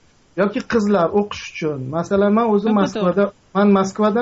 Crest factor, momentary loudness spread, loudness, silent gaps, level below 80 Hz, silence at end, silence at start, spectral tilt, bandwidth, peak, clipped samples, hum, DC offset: 14 dB; 9 LU; -18 LUFS; none; -52 dBFS; 0 s; 0.35 s; -6 dB/octave; 7.8 kHz; -4 dBFS; under 0.1%; none; under 0.1%